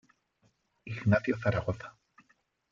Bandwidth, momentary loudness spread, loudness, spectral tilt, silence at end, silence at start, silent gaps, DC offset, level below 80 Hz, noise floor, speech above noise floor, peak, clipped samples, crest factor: 7.2 kHz; 19 LU; -31 LUFS; -8.5 dB/octave; 0.8 s; 0.85 s; none; under 0.1%; -58 dBFS; -72 dBFS; 43 dB; -12 dBFS; under 0.1%; 22 dB